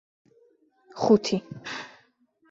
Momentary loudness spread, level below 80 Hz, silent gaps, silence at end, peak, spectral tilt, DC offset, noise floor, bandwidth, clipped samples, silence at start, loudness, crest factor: 22 LU; -68 dBFS; none; 0.65 s; -6 dBFS; -5.5 dB/octave; under 0.1%; -65 dBFS; 7.8 kHz; under 0.1%; 0.95 s; -26 LUFS; 22 dB